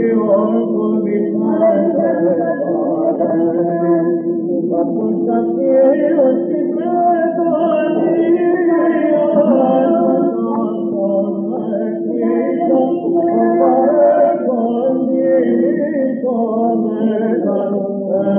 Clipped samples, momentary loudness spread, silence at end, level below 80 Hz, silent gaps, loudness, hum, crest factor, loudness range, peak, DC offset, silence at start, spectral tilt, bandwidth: under 0.1%; 6 LU; 0 s; -78 dBFS; none; -15 LUFS; none; 12 dB; 2 LU; -2 dBFS; under 0.1%; 0 s; -8 dB/octave; 3.4 kHz